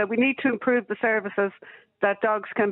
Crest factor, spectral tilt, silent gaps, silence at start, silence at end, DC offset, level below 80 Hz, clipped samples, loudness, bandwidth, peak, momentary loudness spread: 16 dB; -3.5 dB/octave; none; 0 s; 0 s; under 0.1%; -74 dBFS; under 0.1%; -24 LUFS; 4.1 kHz; -8 dBFS; 5 LU